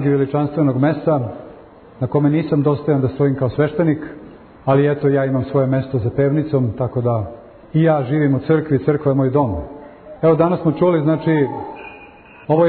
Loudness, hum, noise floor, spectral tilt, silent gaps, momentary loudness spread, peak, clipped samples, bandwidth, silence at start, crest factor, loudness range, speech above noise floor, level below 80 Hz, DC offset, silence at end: -17 LUFS; none; -42 dBFS; -13 dB/octave; none; 13 LU; -4 dBFS; under 0.1%; 4.5 kHz; 0 s; 14 dB; 1 LU; 25 dB; -46 dBFS; under 0.1%; 0 s